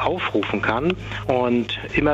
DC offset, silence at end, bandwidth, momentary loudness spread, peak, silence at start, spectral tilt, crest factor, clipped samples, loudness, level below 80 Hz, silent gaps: under 0.1%; 0 s; 8 kHz; 4 LU; -4 dBFS; 0 s; -6.5 dB/octave; 18 dB; under 0.1%; -22 LUFS; -42 dBFS; none